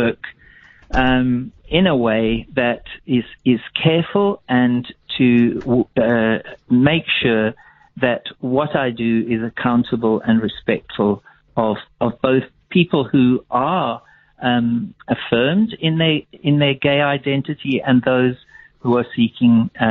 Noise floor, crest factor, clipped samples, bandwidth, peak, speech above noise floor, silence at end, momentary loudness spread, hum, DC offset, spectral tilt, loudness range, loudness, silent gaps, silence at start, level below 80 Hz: -47 dBFS; 18 dB; under 0.1%; 4.3 kHz; 0 dBFS; 30 dB; 0 s; 8 LU; none; under 0.1%; -5 dB/octave; 2 LU; -18 LUFS; none; 0 s; -42 dBFS